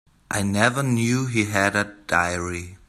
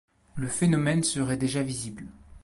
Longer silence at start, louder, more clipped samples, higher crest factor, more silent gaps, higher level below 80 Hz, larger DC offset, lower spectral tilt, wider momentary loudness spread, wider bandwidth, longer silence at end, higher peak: about the same, 0.3 s vs 0.35 s; first, -22 LUFS vs -27 LUFS; neither; about the same, 20 dB vs 16 dB; neither; about the same, -54 dBFS vs -52 dBFS; neither; about the same, -4.5 dB/octave vs -5 dB/octave; second, 7 LU vs 19 LU; first, 15 kHz vs 11.5 kHz; about the same, 0.1 s vs 0.05 s; first, -2 dBFS vs -12 dBFS